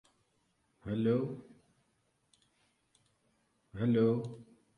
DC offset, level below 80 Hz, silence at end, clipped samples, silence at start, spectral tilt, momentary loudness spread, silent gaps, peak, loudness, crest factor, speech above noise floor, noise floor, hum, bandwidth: under 0.1%; -68 dBFS; 0.35 s; under 0.1%; 0.85 s; -9.5 dB/octave; 21 LU; none; -18 dBFS; -33 LUFS; 20 dB; 45 dB; -77 dBFS; none; 9.8 kHz